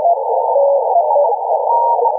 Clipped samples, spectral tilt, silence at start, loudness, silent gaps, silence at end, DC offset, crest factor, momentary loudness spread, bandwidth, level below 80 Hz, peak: under 0.1%; -9.5 dB/octave; 0 s; -14 LUFS; none; 0 s; under 0.1%; 10 dB; 2 LU; 1.1 kHz; -82 dBFS; -4 dBFS